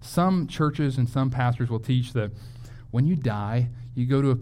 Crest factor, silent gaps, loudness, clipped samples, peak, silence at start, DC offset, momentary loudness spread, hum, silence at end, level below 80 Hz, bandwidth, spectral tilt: 14 dB; none; -25 LUFS; under 0.1%; -10 dBFS; 0 s; under 0.1%; 7 LU; none; 0 s; -48 dBFS; 14 kHz; -8 dB/octave